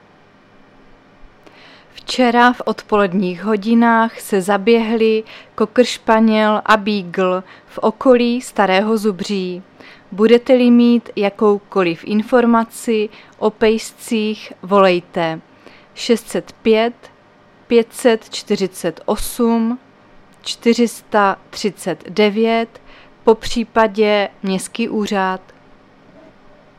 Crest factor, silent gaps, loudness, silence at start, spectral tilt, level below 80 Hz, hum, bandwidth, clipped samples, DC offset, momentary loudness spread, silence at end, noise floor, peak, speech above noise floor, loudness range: 16 dB; none; -16 LUFS; 2.1 s; -5 dB/octave; -46 dBFS; none; 14.5 kHz; under 0.1%; under 0.1%; 10 LU; 1.4 s; -48 dBFS; 0 dBFS; 33 dB; 4 LU